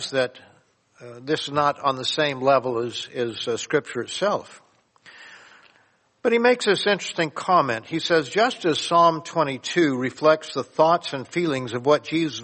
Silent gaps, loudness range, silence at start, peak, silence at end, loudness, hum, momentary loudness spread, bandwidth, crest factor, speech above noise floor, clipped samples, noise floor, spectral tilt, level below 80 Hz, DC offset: none; 5 LU; 0 s; -4 dBFS; 0 s; -22 LUFS; none; 9 LU; 8.8 kHz; 20 dB; 39 dB; under 0.1%; -62 dBFS; -4.5 dB/octave; -70 dBFS; under 0.1%